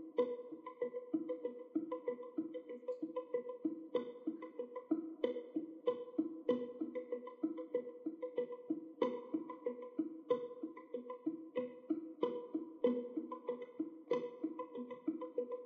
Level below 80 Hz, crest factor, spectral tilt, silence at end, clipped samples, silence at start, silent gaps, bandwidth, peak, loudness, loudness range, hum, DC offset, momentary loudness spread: under -90 dBFS; 22 dB; -5 dB/octave; 0 s; under 0.1%; 0 s; none; 4.8 kHz; -20 dBFS; -43 LUFS; 2 LU; none; under 0.1%; 8 LU